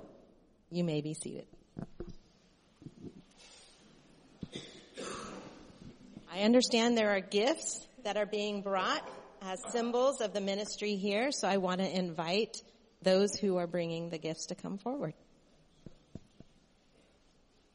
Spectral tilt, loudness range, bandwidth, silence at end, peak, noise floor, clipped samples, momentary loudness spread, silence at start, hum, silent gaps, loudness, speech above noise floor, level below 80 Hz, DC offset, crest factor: -4 dB/octave; 17 LU; 11 kHz; 1.55 s; -16 dBFS; -67 dBFS; under 0.1%; 23 LU; 0 s; none; none; -33 LUFS; 34 dB; -66 dBFS; under 0.1%; 20 dB